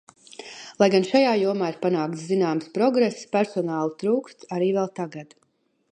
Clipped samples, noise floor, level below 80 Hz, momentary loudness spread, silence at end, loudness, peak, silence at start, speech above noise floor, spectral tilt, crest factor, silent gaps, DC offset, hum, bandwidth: under 0.1%; -42 dBFS; -76 dBFS; 15 LU; 0.7 s; -23 LUFS; -4 dBFS; 0.4 s; 19 dB; -6 dB/octave; 20 dB; none; under 0.1%; none; 10.5 kHz